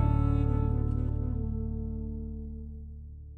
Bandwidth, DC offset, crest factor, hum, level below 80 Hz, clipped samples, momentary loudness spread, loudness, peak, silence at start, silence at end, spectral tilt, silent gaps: 3.9 kHz; under 0.1%; 14 dB; 60 Hz at -60 dBFS; -34 dBFS; under 0.1%; 16 LU; -32 LUFS; -16 dBFS; 0 s; 0 s; -11.5 dB/octave; none